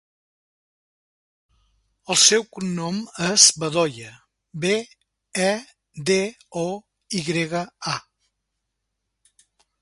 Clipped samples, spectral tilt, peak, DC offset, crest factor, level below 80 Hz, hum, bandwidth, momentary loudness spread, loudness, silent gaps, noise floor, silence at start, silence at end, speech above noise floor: under 0.1%; -2 dB/octave; 0 dBFS; under 0.1%; 26 dB; -64 dBFS; none; 11.5 kHz; 16 LU; -21 LUFS; none; -79 dBFS; 2.1 s; 1.8 s; 57 dB